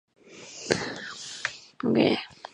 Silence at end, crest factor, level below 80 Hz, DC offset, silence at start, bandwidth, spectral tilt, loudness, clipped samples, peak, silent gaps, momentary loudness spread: 0.05 s; 24 dB; -64 dBFS; under 0.1%; 0.25 s; 11 kHz; -4 dB/octave; -28 LUFS; under 0.1%; -6 dBFS; none; 16 LU